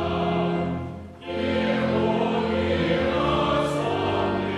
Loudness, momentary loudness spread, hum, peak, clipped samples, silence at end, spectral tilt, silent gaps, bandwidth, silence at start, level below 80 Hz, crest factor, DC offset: -24 LUFS; 7 LU; none; -10 dBFS; under 0.1%; 0 s; -7 dB/octave; none; 11.5 kHz; 0 s; -44 dBFS; 14 dB; under 0.1%